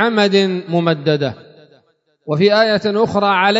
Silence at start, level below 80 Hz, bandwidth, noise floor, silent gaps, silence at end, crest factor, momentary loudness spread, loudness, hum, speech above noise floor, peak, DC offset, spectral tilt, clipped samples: 0 s; -58 dBFS; 7.8 kHz; -59 dBFS; none; 0 s; 16 dB; 9 LU; -15 LUFS; none; 44 dB; 0 dBFS; under 0.1%; -6 dB/octave; under 0.1%